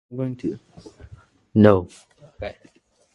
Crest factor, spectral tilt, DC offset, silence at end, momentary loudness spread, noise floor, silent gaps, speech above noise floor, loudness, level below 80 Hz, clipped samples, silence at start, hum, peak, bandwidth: 24 dB; -8.5 dB/octave; under 0.1%; 0.6 s; 21 LU; -47 dBFS; none; 26 dB; -20 LUFS; -48 dBFS; under 0.1%; 0.1 s; none; 0 dBFS; 10.5 kHz